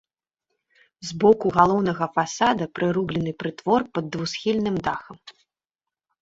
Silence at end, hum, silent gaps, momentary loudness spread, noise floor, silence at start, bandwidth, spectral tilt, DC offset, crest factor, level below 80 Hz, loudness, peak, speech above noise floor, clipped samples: 0.9 s; none; none; 11 LU; -89 dBFS; 1 s; 8 kHz; -5.5 dB/octave; under 0.1%; 22 dB; -56 dBFS; -23 LUFS; -2 dBFS; 67 dB; under 0.1%